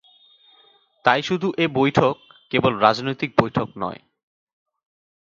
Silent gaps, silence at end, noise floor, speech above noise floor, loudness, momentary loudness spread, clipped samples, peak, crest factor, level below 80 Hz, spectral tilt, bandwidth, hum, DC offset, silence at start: none; 1.25 s; -57 dBFS; 37 dB; -21 LUFS; 12 LU; under 0.1%; 0 dBFS; 22 dB; -56 dBFS; -6.5 dB/octave; 7.6 kHz; none; under 0.1%; 1.05 s